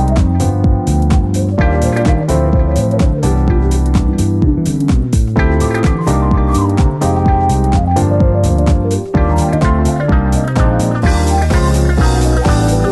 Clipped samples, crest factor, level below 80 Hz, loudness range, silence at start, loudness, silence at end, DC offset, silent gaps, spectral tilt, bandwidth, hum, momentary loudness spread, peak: under 0.1%; 12 dB; -16 dBFS; 1 LU; 0 s; -13 LUFS; 0 s; under 0.1%; none; -7 dB/octave; 12.5 kHz; none; 2 LU; 0 dBFS